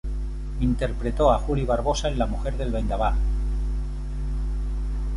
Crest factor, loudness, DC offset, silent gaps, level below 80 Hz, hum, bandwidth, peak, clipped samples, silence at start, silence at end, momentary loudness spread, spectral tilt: 18 dB; -26 LUFS; under 0.1%; none; -26 dBFS; none; 11 kHz; -4 dBFS; under 0.1%; 0.05 s; 0 s; 10 LU; -6.5 dB/octave